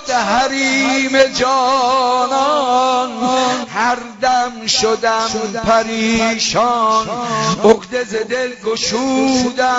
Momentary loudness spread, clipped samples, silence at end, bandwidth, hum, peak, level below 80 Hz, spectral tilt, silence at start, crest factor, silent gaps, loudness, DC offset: 6 LU; under 0.1%; 0 s; 8 kHz; none; 0 dBFS; -46 dBFS; -3 dB/octave; 0 s; 16 dB; none; -15 LUFS; under 0.1%